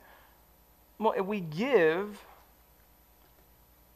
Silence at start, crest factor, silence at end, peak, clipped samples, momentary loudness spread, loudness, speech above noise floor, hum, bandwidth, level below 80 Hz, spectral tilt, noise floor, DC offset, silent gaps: 1 s; 22 dB; 1.75 s; -12 dBFS; under 0.1%; 13 LU; -29 LUFS; 33 dB; 50 Hz at -60 dBFS; 15 kHz; -66 dBFS; -6.5 dB/octave; -61 dBFS; under 0.1%; none